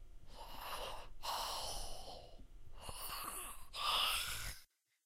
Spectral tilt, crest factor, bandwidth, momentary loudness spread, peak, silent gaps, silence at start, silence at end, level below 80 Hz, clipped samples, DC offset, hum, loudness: -0.5 dB/octave; 20 dB; 16 kHz; 21 LU; -24 dBFS; none; 0 s; 0.4 s; -54 dBFS; under 0.1%; under 0.1%; none; -42 LUFS